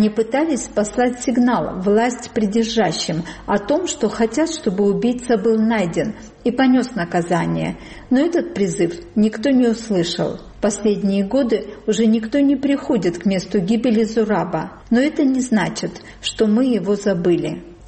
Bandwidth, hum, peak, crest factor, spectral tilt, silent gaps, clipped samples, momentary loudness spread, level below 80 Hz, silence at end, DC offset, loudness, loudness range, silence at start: 8.8 kHz; none; -6 dBFS; 12 dB; -5.5 dB/octave; none; under 0.1%; 6 LU; -46 dBFS; 0 s; under 0.1%; -19 LUFS; 1 LU; 0 s